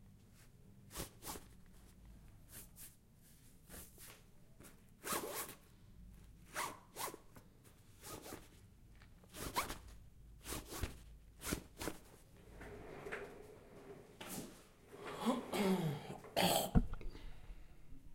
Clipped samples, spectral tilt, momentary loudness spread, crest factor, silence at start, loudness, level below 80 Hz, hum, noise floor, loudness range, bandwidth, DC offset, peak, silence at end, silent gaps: under 0.1%; -4 dB/octave; 25 LU; 30 dB; 0 s; -43 LUFS; -54 dBFS; none; -64 dBFS; 15 LU; 16.5 kHz; under 0.1%; -16 dBFS; 0 s; none